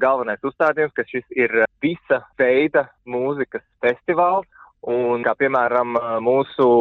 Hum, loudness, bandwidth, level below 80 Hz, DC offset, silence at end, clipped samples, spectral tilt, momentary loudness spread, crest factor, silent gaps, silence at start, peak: none; -20 LUFS; 4.5 kHz; -62 dBFS; under 0.1%; 0 s; under 0.1%; -8 dB/octave; 8 LU; 14 dB; none; 0 s; -4 dBFS